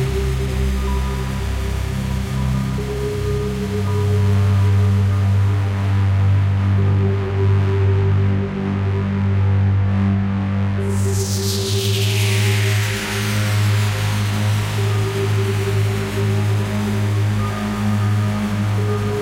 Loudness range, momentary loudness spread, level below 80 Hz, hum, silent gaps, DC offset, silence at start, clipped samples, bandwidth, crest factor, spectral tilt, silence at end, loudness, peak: 3 LU; 5 LU; -30 dBFS; none; none; under 0.1%; 0 s; under 0.1%; 16 kHz; 12 dB; -6 dB/octave; 0 s; -19 LUFS; -6 dBFS